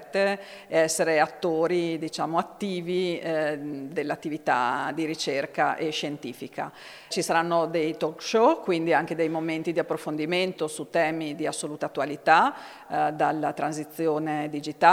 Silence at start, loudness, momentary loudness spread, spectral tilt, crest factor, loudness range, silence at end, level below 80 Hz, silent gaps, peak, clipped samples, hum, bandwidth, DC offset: 0 s; -26 LUFS; 10 LU; -4.5 dB/octave; 22 dB; 3 LU; 0 s; -74 dBFS; none; -4 dBFS; under 0.1%; none; 16.5 kHz; under 0.1%